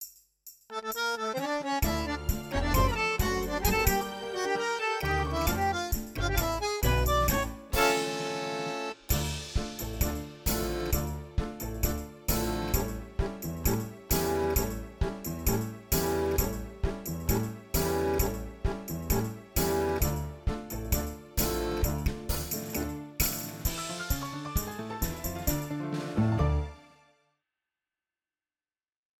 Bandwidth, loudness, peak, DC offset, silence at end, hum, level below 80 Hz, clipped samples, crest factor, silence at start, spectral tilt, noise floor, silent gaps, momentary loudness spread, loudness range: 19.5 kHz; -31 LUFS; -10 dBFS; under 0.1%; 2.35 s; none; -36 dBFS; under 0.1%; 20 dB; 0 s; -4.5 dB/octave; under -90 dBFS; none; 8 LU; 4 LU